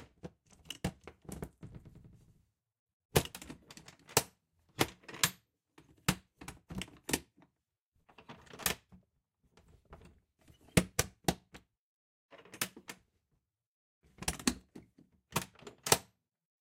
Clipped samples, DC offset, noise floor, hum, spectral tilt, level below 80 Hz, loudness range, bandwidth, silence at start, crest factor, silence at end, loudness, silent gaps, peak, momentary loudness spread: under 0.1%; under 0.1%; -85 dBFS; none; -3 dB/octave; -56 dBFS; 6 LU; 16.5 kHz; 0 s; 32 dB; 0.6 s; -36 LUFS; 2.79-2.86 s, 2.93-3.09 s, 7.82-7.92 s, 11.78-12.29 s, 13.66-14.01 s; -8 dBFS; 23 LU